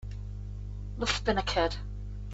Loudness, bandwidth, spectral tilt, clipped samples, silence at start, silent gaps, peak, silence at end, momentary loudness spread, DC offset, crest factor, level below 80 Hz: -32 LUFS; 8 kHz; -4.5 dB/octave; under 0.1%; 0 s; none; -14 dBFS; 0 s; 13 LU; under 0.1%; 20 dB; -40 dBFS